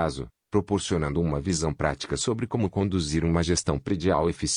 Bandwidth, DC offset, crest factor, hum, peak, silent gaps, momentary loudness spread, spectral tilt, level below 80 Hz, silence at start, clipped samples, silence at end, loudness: 10.5 kHz; under 0.1%; 18 dB; none; -8 dBFS; none; 4 LU; -5 dB/octave; -44 dBFS; 0 s; under 0.1%; 0 s; -26 LUFS